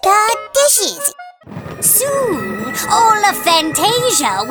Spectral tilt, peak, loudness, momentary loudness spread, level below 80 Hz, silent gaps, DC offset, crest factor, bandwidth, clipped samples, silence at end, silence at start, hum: -1.5 dB/octave; 0 dBFS; -13 LUFS; 9 LU; -50 dBFS; none; under 0.1%; 14 dB; over 20 kHz; under 0.1%; 0 s; 0.05 s; none